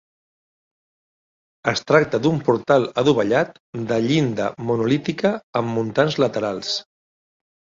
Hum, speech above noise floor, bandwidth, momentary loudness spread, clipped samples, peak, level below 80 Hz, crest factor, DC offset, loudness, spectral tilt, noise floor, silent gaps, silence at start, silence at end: none; over 70 dB; 7.6 kHz; 8 LU; under 0.1%; -2 dBFS; -58 dBFS; 20 dB; under 0.1%; -20 LUFS; -6 dB/octave; under -90 dBFS; 3.60-3.73 s, 5.43-5.53 s; 1.65 s; 0.95 s